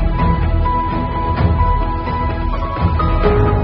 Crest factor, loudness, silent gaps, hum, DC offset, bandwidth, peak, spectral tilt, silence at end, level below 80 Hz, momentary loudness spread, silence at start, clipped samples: 12 dB; -17 LUFS; none; none; under 0.1%; 5.4 kHz; -2 dBFS; -7 dB/octave; 0 s; -18 dBFS; 5 LU; 0 s; under 0.1%